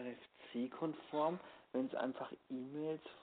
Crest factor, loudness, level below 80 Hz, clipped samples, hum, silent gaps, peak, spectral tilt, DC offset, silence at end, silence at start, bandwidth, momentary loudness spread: 18 dB; -43 LUFS; -86 dBFS; under 0.1%; none; none; -24 dBFS; -5 dB/octave; under 0.1%; 0 s; 0 s; 4.5 kHz; 10 LU